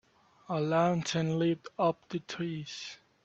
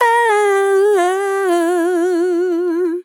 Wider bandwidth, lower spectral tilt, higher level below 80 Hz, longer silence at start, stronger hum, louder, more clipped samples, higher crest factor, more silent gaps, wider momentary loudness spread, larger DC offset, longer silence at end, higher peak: second, 8.2 kHz vs 17.5 kHz; first, -6 dB/octave vs -1.5 dB/octave; first, -70 dBFS vs under -90 dBFS; first, 0.5 s vs 0 s; neither; second, -32 LUFS vs -15 LUFS; neither; first, 18 dB vs 12 dB; neither; first, 12 LU vs 4 LU; neither; first, 0.3 s vs 0.05 s; second, -14 dBFS vs -4 dBFS